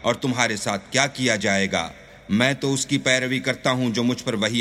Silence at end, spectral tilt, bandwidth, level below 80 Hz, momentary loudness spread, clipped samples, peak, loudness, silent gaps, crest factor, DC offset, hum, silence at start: 0 s; -3.5 dB/octave; 15 kHz; -56 dBFS; 4 LU; under 0.1%; -2 dBFS; -22 LUFS; none; 20 dB; under 0.1%; none; 0 s